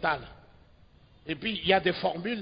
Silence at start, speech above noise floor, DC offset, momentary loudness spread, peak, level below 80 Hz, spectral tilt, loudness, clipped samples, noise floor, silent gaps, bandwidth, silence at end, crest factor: 0 s; 29 dB; under 0.1%; 19 LU; -8 dBFS; -56 dBFS; -8.5 dB/octave; -28 LUFS; under 0.1%; -58 dBFS; none; 5.2 kHz; 0 s; 22 dB